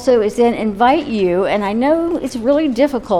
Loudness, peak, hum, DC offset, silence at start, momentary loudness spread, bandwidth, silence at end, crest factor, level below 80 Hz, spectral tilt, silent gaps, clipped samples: -15 LUFS; -2 dBFS; none; under 0.1%; 0 s; 3 LU; 14 kHz; 0 s; 14 dB; -44 dBFS; -6 dB/octave; none; under 0.1%